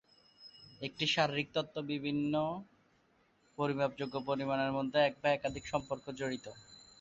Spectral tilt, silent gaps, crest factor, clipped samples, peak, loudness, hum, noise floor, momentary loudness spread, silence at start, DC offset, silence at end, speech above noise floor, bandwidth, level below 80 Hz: -5 dB/octave; none; 22 dB; under 0.1%; -14 dBFS; -35 LUFS; none; -71 dBFS; 21 LU; 0.4 s; under 0.1%; 0.25 s; 36 dB; 7.8 kHz; -68 dBFS